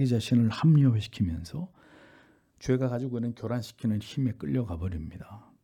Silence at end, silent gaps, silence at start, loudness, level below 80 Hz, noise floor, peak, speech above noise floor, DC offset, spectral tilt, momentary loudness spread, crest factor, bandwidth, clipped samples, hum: 0.25 s; none; 0 s; -28 LUFS; -54 dBFS; -60 dBFS; -12 dBFS; 32 dB; under 0.1%; -8 dB/octave; 17 LU; 16 dB; 13 kHz; under 0.1%; none